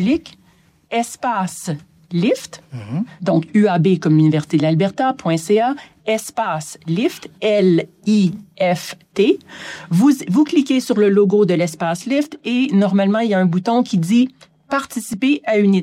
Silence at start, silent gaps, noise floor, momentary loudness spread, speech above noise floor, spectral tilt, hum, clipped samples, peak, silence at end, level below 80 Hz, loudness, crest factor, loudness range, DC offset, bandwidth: 0 s; none; -54 dBFS; 10 LU; 37 dB; -6.5 dB/octave; none; under 0.1%; -4 dBFS; 0 s; -62 dBFS; -17 LUFS; 14 dB; 3 LU; under 0.1%; 15.5 kHz